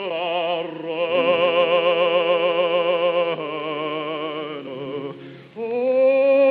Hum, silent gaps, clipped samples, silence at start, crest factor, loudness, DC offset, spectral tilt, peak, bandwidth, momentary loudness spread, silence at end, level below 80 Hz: none; none; under 0.1%; 0 s; 14 dB; -21 LUFS; under 0.1%; -7.5 dB/octave; -6 dBFS; 4.8 kHz; 14 LU; 0 s; -78 dBFS